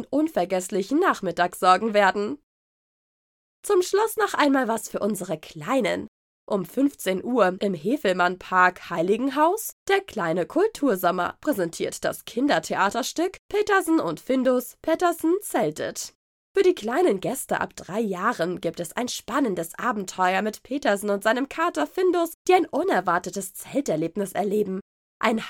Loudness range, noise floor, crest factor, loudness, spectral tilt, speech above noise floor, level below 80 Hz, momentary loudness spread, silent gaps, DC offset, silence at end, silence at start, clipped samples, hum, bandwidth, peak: 3 LU; under -90 dBFS; 20 dB; -24 LUFS; -4.5 dB/octave; over 66 dB; -62 dBFS; 8 LU; 2.43-3.63 s, 6.08-6.47 s, 9.72-9.86 s, 13.39-13.49 s, 16.15-16.55 s, 22.34-22.45 s, 24.81-25.20 s; under 0.1%; 0 s; 0 s; under 0.1%; none; 19 kHz; -4 dBFS